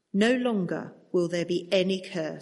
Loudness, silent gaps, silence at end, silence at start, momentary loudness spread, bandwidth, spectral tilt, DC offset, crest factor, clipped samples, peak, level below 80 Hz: -27 LUFS; none; 0 s; 0.15 s; 9 LU; 11.5 kHz; -5.5 dB/octave; under 0.1%; 18 dB; under 0.1%; -10 dBFS; -72 dBFS